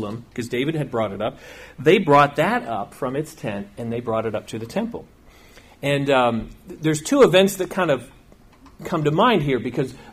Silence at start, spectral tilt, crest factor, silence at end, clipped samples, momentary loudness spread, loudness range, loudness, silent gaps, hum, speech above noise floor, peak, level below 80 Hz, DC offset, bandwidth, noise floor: 0 s; -5.5 dB/octave; 18 dB; 0 s; under 0.1%; 15 LU; 6 LU; -21 LUFS; none; none; 29 dB; -4 dBFS; -50 dBFS; under 0.1%; 15.5 kHz; -49 dBFS